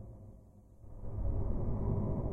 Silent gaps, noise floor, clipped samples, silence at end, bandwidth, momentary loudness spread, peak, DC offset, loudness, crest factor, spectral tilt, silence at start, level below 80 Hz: none; -57 dBFS; under 0.1%; 0 s; 2.4 kHz; 21 LU; -20 dBFS; under 0.1%; -38 LUFS; 16 dB; -12.5 dB/octave; 0 s; -40 dBFS